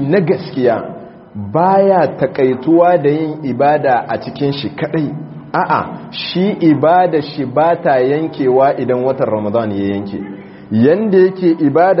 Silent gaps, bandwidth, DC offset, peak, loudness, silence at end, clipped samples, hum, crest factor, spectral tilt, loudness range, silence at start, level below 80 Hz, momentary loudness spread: none; 5.8 kHz; under 0.1%; 0 dBFS; -14 LUFS; 0 s; under 0.1%; none; 14 dB; -5.5 dB/octave; 3 LU; 0 s; -56 dBFS; 11 LU